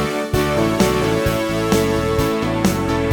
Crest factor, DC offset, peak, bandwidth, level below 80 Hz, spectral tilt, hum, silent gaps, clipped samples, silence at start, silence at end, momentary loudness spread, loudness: 18 dB; under 0.1%; 0 dBFS; 19.5 kHz; -34 dBFS; -5.5 dB/octave; none; none; under 0.1%; 0 s; 0 s; 3 LU; -18 LUFS